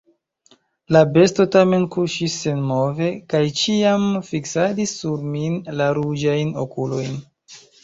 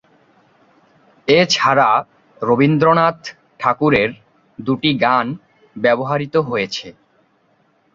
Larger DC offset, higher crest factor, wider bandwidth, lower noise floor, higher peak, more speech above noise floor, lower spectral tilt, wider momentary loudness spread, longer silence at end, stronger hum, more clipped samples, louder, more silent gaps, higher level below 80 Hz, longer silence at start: neither; about the same, 18 dB vs 18 dB; about the same, 8 kHz vs 7.6 kHz; about the same, -57 dBFS vs -59 dBFS; about the same, -2 dBFS vs 0 dBFS; second, 39 dB vs 44 dB; about the same, -5.5 dB/octave vs -5.5 dB/octave; second, 10 LU vs 14 LU; second, 0.25 s vs 1.05 s; neither; neither; second, -19 LUFS vs -16 LUFS; neither; about the same, -56 dBFS vs -54 dBFS; second, 0.9 s vs 1.25 s